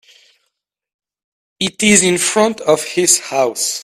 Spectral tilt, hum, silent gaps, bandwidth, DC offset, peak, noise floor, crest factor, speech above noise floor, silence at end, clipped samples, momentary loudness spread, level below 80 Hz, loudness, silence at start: -2.5 dB/octave; none; none; 16 kHz; under 0.1%; 0 dBFS; -73 dBFS; 16 dB; 59 dB; 0 s; under 0.1%; 7 LU; -56 dBFS; -13 LUFS; 1.6 s